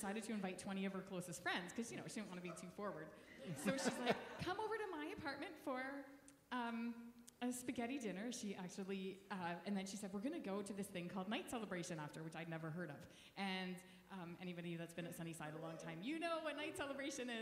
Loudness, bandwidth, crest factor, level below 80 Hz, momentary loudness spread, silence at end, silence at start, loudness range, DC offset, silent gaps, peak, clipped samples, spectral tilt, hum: -47 LUFS; 16 kHz; 22 dB; -80 dBFS; 8 LU; 0 s; 0 s; 4 LU; under 0.1%; none; -24 dBFS; under 0.1%; -4.5 dB/octave; none